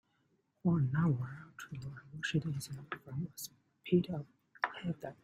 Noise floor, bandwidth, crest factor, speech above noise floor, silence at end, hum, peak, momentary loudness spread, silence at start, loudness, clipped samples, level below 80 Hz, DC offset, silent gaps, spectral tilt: -77 dBFS; 16 kHz; 22 dB; 41 dB; 0.1 s; none; -14 dBFS; 16 LU; 0.65 s; -37 LUFS; under 0.1%; -68 dBFS; under 0.1%; none; -6.5 dB/octave